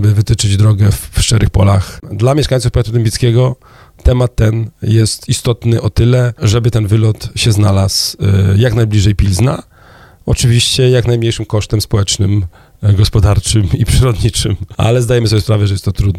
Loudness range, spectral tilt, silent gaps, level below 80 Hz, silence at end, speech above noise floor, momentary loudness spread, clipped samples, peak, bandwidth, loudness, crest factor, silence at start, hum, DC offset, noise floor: 2 LU; -5.5 dB/octave; none; -24 dBFS; 0 s; 30 dB; 5 LU; under 0.1%; 0 dBFS; 14.5 kHz; -12 LUFS; 12 dB; 0 s; none; under 0.1%; -40 dBFS